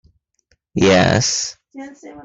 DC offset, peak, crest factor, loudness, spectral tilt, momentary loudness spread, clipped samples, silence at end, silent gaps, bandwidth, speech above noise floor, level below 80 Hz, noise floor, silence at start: under 0.1%; -2 dBFS; 18 dB; -15 LUFS; -4 dB/octave; 23 LU; under 0.1%; 0 s; none; 8.4 kHz; 47 dB; -50 dBFS; -64 dBFS; 0.75 s